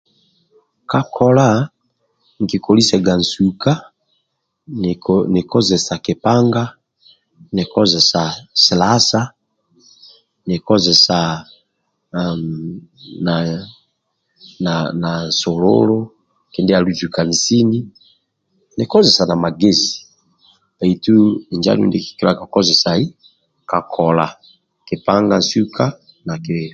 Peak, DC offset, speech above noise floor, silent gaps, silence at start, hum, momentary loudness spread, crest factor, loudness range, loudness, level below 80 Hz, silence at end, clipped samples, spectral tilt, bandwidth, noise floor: 0 dBFS; under 0.1%; 55 dB; none; 0.9 s; none; 14 LU; 16 dB; 4 LU; -15 LUFS; -48 dBFS; 0 s; under 0.1%; -5 dB/octave; 9.2 kHz; -70 dBFS